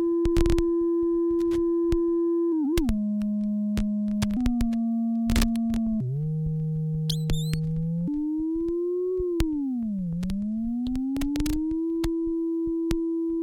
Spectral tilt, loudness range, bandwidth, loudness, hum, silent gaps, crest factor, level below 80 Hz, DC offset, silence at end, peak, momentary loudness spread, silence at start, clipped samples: -7 dB/octave; 3 LU; 17 kHz; -26 LUFS; none; none; 18 dB; -36 dBFS; under 0.1%; 0 s; -8 dBFS; 4 LU; 0 s; under 0.1%